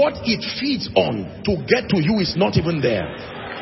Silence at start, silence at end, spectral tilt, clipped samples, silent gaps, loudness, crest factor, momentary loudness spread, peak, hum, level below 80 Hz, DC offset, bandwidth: 0 s; 0 s; -6.5 dB/octave; under 0.1%; none; -20 LUFS; 18 dB; 7 LU; -2 dBFS; none; -46 dBFS; under 0.1%; 6 kHz